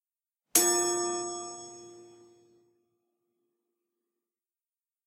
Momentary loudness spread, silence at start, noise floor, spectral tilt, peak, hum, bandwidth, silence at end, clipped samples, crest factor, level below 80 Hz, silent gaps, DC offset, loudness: 22 LU; 0.55 s; under -90 dBFS; -0.5 dB/octave; -4 dBFS; none; 16 kHz; 3 s; under 0.1%; 32 dB; -84 dBFS; none; under 0.1%; -27 LUFS